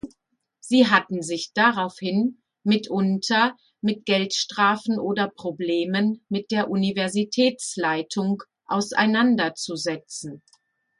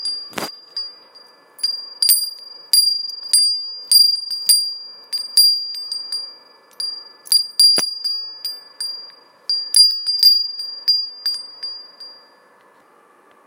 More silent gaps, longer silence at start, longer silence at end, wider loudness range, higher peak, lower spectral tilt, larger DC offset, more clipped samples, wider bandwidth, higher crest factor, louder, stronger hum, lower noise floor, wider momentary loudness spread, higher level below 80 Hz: neither; about the same, 0.05 s vs 0 s; second, 0.65 s vs 1.35 s; about the same, 2 LU vs 4 LU; about the same, -2 dBFS vs 0 dBFS; first, -4.5 dB/octave vs 2.5 dB/octave; neither; neither; second, 11.5 kHz vs 17 kHz; about the same, 20 dB vs 20 dB; second, -23 LUFS vs -15 LUFS; neither; first, -73 dBFS vs -52 dBFS; second, 9 LU vs 17 LU; first, -68 dBFS vs -76 dBFS